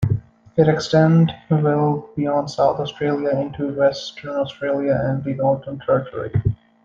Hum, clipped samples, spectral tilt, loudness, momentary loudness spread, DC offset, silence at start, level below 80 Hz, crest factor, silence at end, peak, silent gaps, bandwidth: none; under 0.1%; -7.5 dB/octave; -20 LUFS; 9 LU; under 0.1%; 0 s; -48 dBFS; 18 dB; 0.3 s; -2 dBFS; none; 7.6 kHz